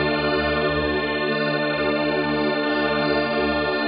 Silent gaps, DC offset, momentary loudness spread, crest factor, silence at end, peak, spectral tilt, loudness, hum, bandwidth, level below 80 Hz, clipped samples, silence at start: none; under 0.1%; 1 LU; 12 dB; 0 s; -10 dBFS; -3 dB/octave; -22 LUFS; none; 5.2 kHz; -42 dBFS; under 0.1%; 0 s